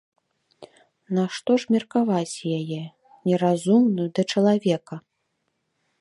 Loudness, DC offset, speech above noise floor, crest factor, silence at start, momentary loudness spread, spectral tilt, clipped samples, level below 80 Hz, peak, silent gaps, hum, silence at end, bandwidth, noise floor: -23 LUFS; under 0.1%; 53 dB; 16 dB; 0.6 s; 13 LU; -6.5 dB/octave; under 0.1%; -72 dBFS; -8 dBFS; none; none; 1 s; 11.5 kHz; -75 dBFS